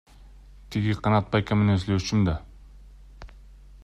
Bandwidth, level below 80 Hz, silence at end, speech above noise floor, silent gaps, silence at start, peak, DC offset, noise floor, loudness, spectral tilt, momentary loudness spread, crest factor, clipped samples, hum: 8.4 kHz; -44 dBFS; 0.1 s; 25 dB; none; 0.25 s; -10 dBFS; under 0.1%; -48 dBFS; -25 LUFS; -7 dB/octave; 6 LU; 18 dB; under 0.1%; none